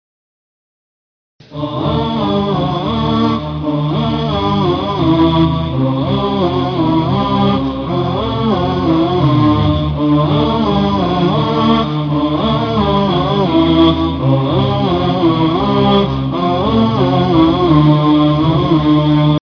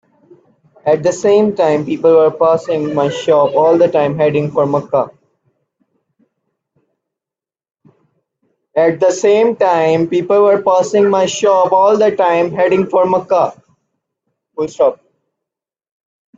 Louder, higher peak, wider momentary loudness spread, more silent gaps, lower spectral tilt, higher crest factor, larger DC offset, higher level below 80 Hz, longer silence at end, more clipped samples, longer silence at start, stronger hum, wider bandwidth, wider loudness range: about the same, -13 LUFS vs -13 LUFS; about the same, 0 dBFS vs 0 dBFS; about the same, 5 LU vs 6 LU; neither; first, -8.5 dB/octave vs -5.5 dB/octave; about the same, 14 dB vs 14 dB; neither; first, -32 dBFS vs -60 dBFS; second, 0.05 s vs 1.45 s; neither; first, 1.5 s vs 0.85 s; neither; second, 5.4 kHz vs 8 kHz; second, 4 LU vs 9 LU